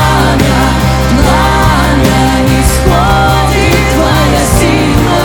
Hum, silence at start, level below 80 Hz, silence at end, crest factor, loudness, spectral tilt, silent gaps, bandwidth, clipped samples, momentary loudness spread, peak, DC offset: none; 0 s; -14 dBFS; 0 s; 8 dB; -8 LUFS; -5 dB/octave; none; 19.5 kHz; 0.6%; 1 LU; 0 dBFS; under 0.1%